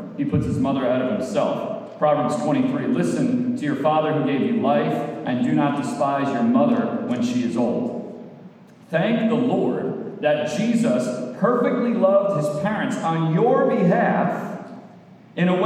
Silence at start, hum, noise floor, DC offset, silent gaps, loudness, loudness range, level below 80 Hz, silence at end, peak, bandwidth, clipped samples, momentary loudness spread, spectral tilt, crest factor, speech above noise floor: 0 s; none; -46 dBFS; under 0.1%; none; -21 LUFS; 3 LU; -56 dBFS; 0 s; -6 dBFS; 11 kHz; under 0.1%; 9 LU; -7 dB/octave; 14 dB; 25 dB